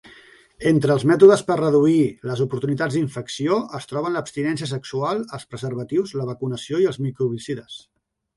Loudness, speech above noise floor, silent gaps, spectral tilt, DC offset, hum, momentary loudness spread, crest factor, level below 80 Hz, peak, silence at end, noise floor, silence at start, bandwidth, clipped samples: -21 LUFS; 29 dB; none; -6.5 dB/octave; under 0.1%; none; 14 LU; 20 dB; -60 dBFS; 0 dBFS; 0.6 s; -49 dBFS; 0.6 s; 11.5 kHz; under 0.1%